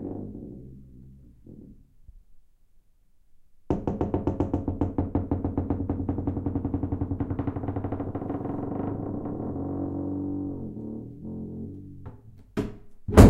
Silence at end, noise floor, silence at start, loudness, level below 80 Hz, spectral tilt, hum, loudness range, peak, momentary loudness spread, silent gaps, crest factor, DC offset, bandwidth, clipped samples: 0 s; -58 dBFS; 0 s; -31 LUFS; -38 dBFS; -8 dB/octave; none; 7 LU; 0 dBFS; 17 LU; none; 28 dB; under 0.1%; 16 kHz; under 0.1%